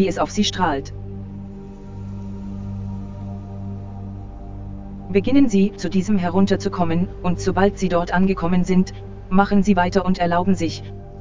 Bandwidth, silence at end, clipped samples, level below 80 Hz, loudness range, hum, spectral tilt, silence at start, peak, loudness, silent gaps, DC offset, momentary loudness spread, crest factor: 7.6 kHz; 0 s; under 0.1%; -36 dBFS; 13 LU; 50 Hz at -40 dBFS; -6.5 dB/octave; 0 s; 0 dBFS; -20 LUFS; none; under 0.1%; 17 LU; 20 dB